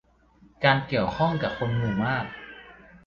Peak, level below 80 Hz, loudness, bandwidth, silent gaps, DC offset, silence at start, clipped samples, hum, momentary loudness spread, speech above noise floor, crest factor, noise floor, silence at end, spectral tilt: -4 dBFS; -52 dBFS; -25 LUFS; 7 kHz; none; under 0.1%; 0.6 s; under 0.1%; none; 18 LU; 33 dB; 22 dB; -58 dBFS; 0.1 s; -7.5 dB/octave